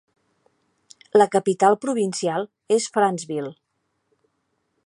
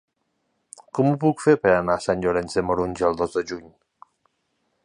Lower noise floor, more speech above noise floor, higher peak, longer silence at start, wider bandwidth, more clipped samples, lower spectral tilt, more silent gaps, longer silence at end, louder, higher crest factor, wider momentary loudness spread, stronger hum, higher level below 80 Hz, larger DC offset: about the same, -73 dBFS vs -73 dBFS; about the same, 53 dB vs 52 dB; about the same, -2 dBFS vs -4 dBFS; first, 1.15 s vs 0.95 s; about the same, 11.5 kHz vs 11 kHz; neither; second, -4.5 dB/octave vs -6.5 dB/octave; neither; first, 1.35 s vs 1.15 s; about the same, -21 LUFS vs -22 LUFS; about the same, 22 dB vs 20 dB; about the same, 11 LU vs 10 LU; neither; second, -76 dBFS vs -50 dBFS; neither